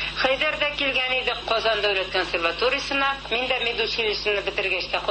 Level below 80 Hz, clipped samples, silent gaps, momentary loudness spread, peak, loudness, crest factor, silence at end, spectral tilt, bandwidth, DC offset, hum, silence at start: -46 dBFS; under 0.1%; none; 3 LU; -8 dBFS; -22 LUFS; 16 dB; 0 s; -3 dB/octave; 8.8 kHz; under 0.1%; none; 0 s